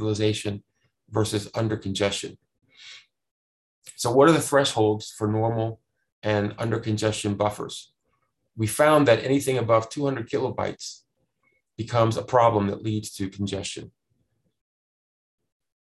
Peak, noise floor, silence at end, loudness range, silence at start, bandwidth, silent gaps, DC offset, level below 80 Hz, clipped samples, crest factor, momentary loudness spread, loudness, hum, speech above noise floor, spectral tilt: -4 dBFS; -74 dBFS; 1.9 s; 6 LU; 0 s; 13 kHz; 3.31-3.82 s, 6.12-6.22 s; under 0.1%; -54 dBFS; under 0.1%; 20 dB; 18 LU; -24 LUFS; none; 50 dB; -5.5 dB/octave